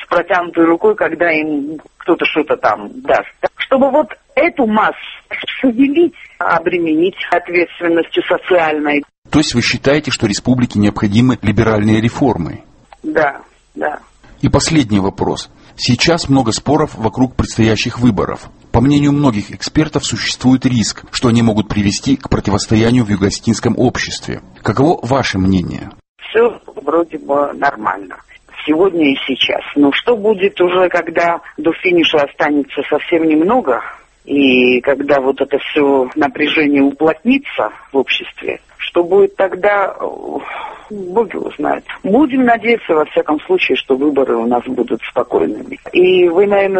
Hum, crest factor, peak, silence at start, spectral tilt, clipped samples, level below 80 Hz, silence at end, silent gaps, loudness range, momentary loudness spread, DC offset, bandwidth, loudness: none; 14 dB; 0 dBFS; 0 s; -5.5 dB/octave; under 0.1%; -38 dBFS; 0 s; 9.18-9.22 s, 26.08-26.16 s; 3 LU; 10 LU; under 0.1%; 8.8 kHz; -14 LUFS